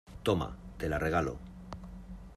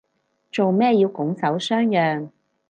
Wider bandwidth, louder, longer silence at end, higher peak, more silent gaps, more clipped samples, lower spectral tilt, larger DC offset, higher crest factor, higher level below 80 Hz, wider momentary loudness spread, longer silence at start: first, 14.5 kHz vs 9.2 kHz; second, -33 LUFS vs -21 LUFS; second, 0 s vs 0.4 s; second, -16 dBFS vs -6 dBFS; neither; neither; about the same, -6.5 dB/octave vs -6.5 dB/octave; neither; first, 20 dB vs 14 dB; first, -48 dBFS vs -72 dBFS; first, 16 LU vs 12 LU; second, 0.05 s vs 0.55 s